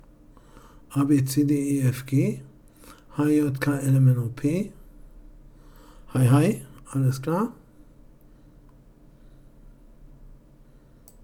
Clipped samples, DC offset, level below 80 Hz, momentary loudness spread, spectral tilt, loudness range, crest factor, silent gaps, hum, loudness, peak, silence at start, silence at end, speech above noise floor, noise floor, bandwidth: under 0.1%; under 0.1%; -52 dBFS; 12 LU; -7.5 dB/octave; 8 LU; 18 dB; none; none; -24 LUFS; -8 dBFS; 0.9 s; 0.95 s; 30 dB; -52 dBFS; 16 kHz